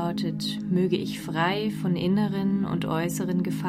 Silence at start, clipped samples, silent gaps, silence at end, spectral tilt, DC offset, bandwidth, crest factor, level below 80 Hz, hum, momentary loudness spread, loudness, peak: 0 s; under 0.1%; none; 0 s; -6 dB/octave; under 0.1%; 15.5 kHz; 14 dB; -58 dBFS; none; 4 LU; -26 LUFS; -12 dBFS